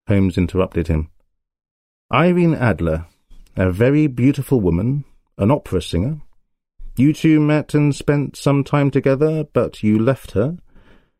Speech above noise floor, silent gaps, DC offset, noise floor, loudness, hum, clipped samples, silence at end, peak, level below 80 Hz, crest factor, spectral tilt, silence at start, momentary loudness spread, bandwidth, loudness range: 38 dB; 1.71-2.09 s; under 0.1%; -55 dBFS; -18 LUFS; none; under 0.1%; 0.65 s; -2 dBFS; -38 dBFS; 16 dB; -8 dB/octave; 0.1 s; 8 LU; 15 kHz; 3 LU